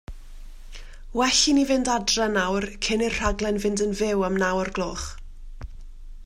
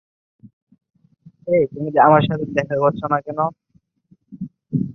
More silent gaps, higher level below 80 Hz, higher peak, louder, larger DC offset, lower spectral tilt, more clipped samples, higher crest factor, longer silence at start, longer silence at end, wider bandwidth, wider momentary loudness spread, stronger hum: second, none vs 0.53-0.67 s, 0.90-0.94 s; first, -38 dBFS vs -56 dBFS; second, -8 dBFS vs -2 dBFS; second, -23 LUFS vs -18 LUFS; neither; second, -3 dB/octave vs -8.5 dB/octave; neither; about the same, 18 dB vs 20 dB; second, 0.1 s vs 0.45 s; about the same, 0 s vs 0 s; first, 16 kHz vs 6.4 kHz; second, 16 LU vs 22 LU; neither